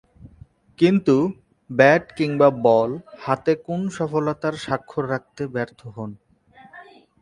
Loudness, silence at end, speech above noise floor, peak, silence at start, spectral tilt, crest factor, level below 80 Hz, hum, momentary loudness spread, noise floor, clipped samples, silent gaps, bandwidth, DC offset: -21 LUFS; 0.4 s; 30 dB; 0 dBFS; 0.25 s; -7 dB/octave; 22 dB; -58 dBFS; none; 15 LU; -51 dBFS; under 0.1%; none; 11 kHz; under 0.1%